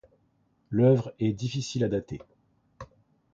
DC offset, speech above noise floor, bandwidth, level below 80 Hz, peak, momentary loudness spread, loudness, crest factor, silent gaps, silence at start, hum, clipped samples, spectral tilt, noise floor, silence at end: under 0.1%; 43 dB; 7.8 kHz; -58 dBFS; -10 dBFS; 26 LU; -27 LUFS; 18 dB; none; 0.7 s; none; under 0.1%; -7 dB/octave; -69 dBFS; 0.5 s